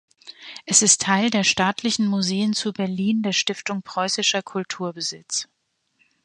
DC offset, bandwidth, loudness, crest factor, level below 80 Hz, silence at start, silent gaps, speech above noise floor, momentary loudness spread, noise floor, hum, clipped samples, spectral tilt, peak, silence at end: under 0.1%; 11.5 kHz; -21 LUFS; 22 dB; -64 dBFS; 0.25 s; none; 44 dB; 13 LU; -67 dBFS; none; under 0.1%; -2.5 dB/octave; -2 dBFS; 0.8 s